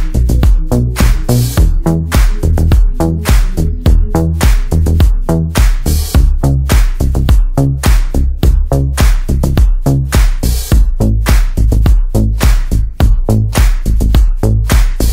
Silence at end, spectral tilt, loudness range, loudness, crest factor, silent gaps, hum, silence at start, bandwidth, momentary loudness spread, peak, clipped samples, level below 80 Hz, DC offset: 0 s; -6 dB/octave; 0 LU; -12 LUFS; 8 dB; none; none; 0 s; 16.5 kHz; 3 LU; 0 dBFS; under 0.1%; -10 dBFS; under 0.1%